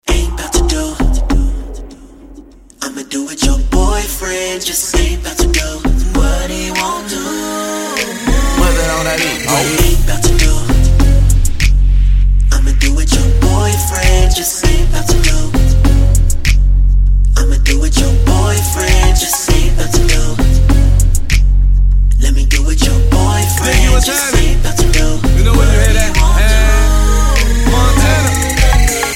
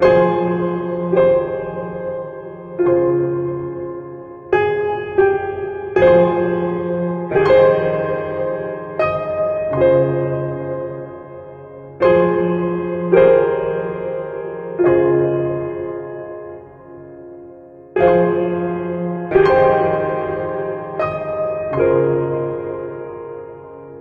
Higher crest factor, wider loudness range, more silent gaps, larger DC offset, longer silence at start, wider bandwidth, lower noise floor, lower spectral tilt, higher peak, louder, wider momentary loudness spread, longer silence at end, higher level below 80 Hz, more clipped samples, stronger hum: second, 10 dB vs 18 dB; about the same, 5 LU vs 5 LU; neither; neither; about the same, 0.05 s vs 0 s; first, 16.5 kHz vs 5.4 kHz; about the same, -36 dBFS vs -39 dBFS; second, -4.5 dB/octave vs -9.5 dB/octave; about the same, 0 dBFS vs 0 dBFS; first, -13 LUFS vs -17 LUFS; second, 6 LU vs 19 LU; about the same, 0 s vs 0 s; first, -12 dBFS vs -48 dBFS; neither; neither